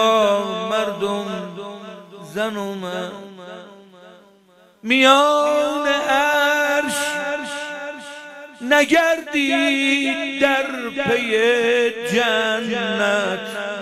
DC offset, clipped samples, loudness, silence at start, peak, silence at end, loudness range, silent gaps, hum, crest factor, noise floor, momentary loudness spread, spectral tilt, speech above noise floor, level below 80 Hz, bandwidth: under 0.1%; under 0.1%; -18 LUFS; 0 s; 0 dBFS; 0 s; 10 LU; none; none; 20 dB; -53 dBFS; 19 LU; -3 dB/octave; 34 dB; -62 dBFS; 15.5 kHz